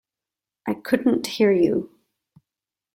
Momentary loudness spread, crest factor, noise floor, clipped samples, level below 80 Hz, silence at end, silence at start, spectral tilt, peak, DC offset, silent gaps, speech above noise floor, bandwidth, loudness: 14 LU; 18 dB; -89 dBFS; under 0.1%; -64 dBFS; 1.1 s; 0.65 s; -5.5 dB/octave; -6 dBFS; under 0.1%; none; 68 dB; 16.5 kHz; -22 LUFS